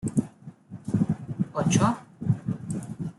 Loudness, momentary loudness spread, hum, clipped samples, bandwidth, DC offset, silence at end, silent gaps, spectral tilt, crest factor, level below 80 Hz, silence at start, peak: -28 LUFS; 14 LU; none; under 0.1%; 12 kHz; under 0.1%; 0.05 s; none; -6 dB/octave; 20 dB; -58 dBFS; 0 s; -8 dBFS